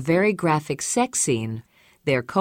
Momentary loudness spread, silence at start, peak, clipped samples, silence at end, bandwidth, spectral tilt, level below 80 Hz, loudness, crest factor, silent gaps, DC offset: 11 LU; 0 s; -6 dBFS; under 0.1%; 0 s; 16.5 kHz; -4.5 dB/octave; -60 dBFS; -23 LUFS; 16 dB; none; under 0.1%